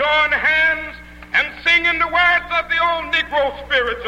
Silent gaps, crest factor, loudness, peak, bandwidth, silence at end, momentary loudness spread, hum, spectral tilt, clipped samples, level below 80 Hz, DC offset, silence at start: none; 14 dB; -16 LUFS; -4 dBFS; 16 kHz; 0 s; 6 LU; 60 Hz at -45 dBFS; -3 dB/octave; under 0.1%; -42 dBFS; under 0.1%; 0 s